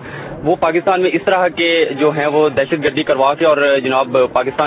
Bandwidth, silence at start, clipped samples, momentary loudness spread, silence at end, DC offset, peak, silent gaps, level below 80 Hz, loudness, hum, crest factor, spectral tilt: 4 kHz; 0 s; under 0.1%; 3 LU; 0 s; under 0.1%; 0 dBFS; none; -48 dBFS; -14 LUFS; none; 14 dB; -9 dB/octave